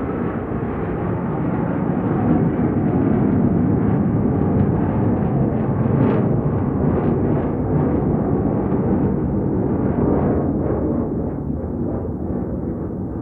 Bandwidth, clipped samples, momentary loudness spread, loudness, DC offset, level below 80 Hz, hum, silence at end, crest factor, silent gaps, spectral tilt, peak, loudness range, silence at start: 3.5 kHz; under 0.1%; 7 LU; -20 LUFS; under 0.1%; -34 dBFS; none; 0 s; 14 dB; none; -13 dB/octave; -4 dBFS; 3 LU; 0 s